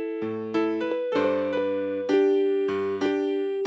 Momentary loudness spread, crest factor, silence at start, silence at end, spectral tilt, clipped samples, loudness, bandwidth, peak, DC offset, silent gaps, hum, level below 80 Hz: 6 LU; 14 dB; 0 s; 0 s; -6.5 dB/octave; under 0.1%; -25 LUFS; 7.8 kHz; -12 dBFS; under 0.1%; none; none; -68 dBFS